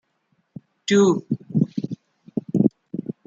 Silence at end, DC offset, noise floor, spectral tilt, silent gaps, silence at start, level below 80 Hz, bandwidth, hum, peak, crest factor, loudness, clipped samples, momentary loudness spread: 0.15 s; under 0.1%; -69 dBFS; -6.5 dB/octave; none; 0.9 s; -64 dBFS; 7.8 kHz; none; -2 dBFS; 22 dB; -22 LUFS; under 0.1%; 15 LU